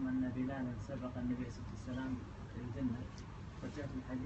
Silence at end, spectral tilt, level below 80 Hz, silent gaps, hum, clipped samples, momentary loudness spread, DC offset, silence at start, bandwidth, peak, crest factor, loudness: 0 s; -7.5 dB/octave; -54 dBFS; none; none; under 0.1%; 9 LU; under 0.1%; 0 s; 8.2 kHz; -28 dBFS; 14 dB; -43 LUFS